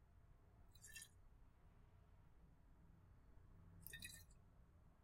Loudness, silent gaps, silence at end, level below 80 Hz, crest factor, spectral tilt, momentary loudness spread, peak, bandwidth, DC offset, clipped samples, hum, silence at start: -60 LUFS; none; 0 s; -70 dBFS; 30 dB; -2.5 dB/octave; 13 LU; -34 dBFS; 16 kHz; under 0.1%; under 0.1%; none; 0 s